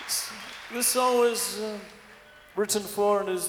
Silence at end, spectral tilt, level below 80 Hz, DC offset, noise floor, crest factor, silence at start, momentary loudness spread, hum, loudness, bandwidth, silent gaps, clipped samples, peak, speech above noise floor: 0 s; -2 dB/octave; -66 dBFS; under 0.1%; -51 dBFS; 18 dB; 0 s; 15 LU; none; -26 LUFS; 20 kHz; none; under 0.1%; -10 dBFS; 25 dB